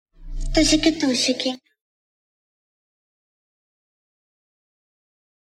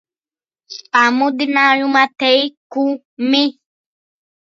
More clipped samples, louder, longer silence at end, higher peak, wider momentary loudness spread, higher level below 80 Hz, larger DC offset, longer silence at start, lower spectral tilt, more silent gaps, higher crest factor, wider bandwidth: neither; second, -20 LUFS vs -15 LUFS; first, 4 s vs 1 s; second, -4 dBFS vs 0 dBFS; first, 19 LU vs 9 LU; first, -36 dBFS vs -74 dBFS; neither; second, 0.2 s vs 0.7 s; about the same, -3 dB/octave vs -2.5 dB/octave; second, none vs 2.57-2.70 s, 3.05-3.17 s; about the same, 22 dB vs 18 dB; first, 13 kHz vs 7.4 kHz